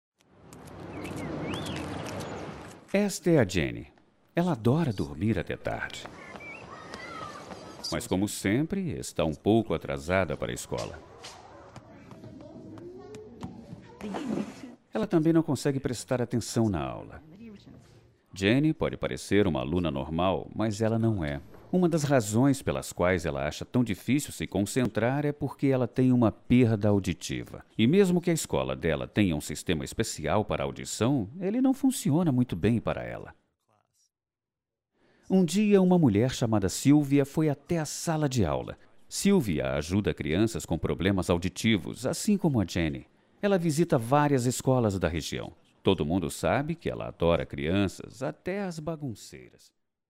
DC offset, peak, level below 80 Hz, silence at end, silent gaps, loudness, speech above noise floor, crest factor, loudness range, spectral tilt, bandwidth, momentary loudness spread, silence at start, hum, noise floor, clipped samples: under 0.1%; -10 dBFS; -50 dBFS; 0.65 s; none; -28 LUFS; over 63 dB; 18 dB; 7 LU; -6 dB/octave; 16 kHz; 18 LU; 0.5 s; none; under -90 dBFS; under 0.1%